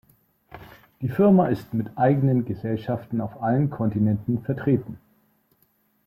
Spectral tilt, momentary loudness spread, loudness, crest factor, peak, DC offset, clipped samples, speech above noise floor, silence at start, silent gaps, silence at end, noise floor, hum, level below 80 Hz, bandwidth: -10.5 dB/octave; 11 LU; -23 LUFS; 16 dB; -8 dBFS; under 0.1%; under 0.1%; 44 dB; 0.55 s; none; 1.1 s; -66 dBFS; none; -58 dBFS; 14.5 kHz